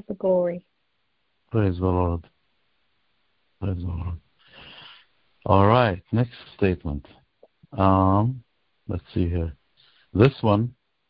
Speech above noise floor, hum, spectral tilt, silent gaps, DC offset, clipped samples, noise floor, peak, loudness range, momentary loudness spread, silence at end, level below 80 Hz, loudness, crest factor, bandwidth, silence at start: 52 dB; none; -10.5 dB/octave; none; under 0.1%; under 0.1%; -74 dBFS; -2 dBFS; 8 LU; 20 LU; 0.4 s; -38 dBFS; -23 LUFS; 22 dB; 5.2 kHz; 0.1 s